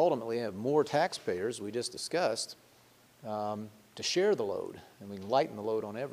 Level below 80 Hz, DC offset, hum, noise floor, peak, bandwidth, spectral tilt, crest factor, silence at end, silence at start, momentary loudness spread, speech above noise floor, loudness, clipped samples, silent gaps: -76 dBFS; under 0.1%; none; -62 dBFS; -14 dBFS; 15.5 kHz; -4 dB/octave; 18 dB; 0 s; 0 s; 16 LU; 29 dB; -33 LUFS; under 0.1%; none